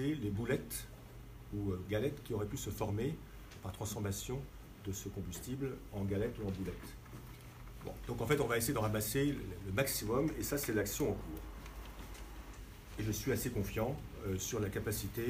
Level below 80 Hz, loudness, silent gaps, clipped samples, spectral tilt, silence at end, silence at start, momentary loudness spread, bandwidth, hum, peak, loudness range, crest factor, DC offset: -52 dBFS; -38 LUFS; none; under 0.1%; -5 dB/octave; 0 s; 0 s; 17 LU; 15.5 kHz; none; -18 dBFS; 6 LU; 20 dB; under 0.1%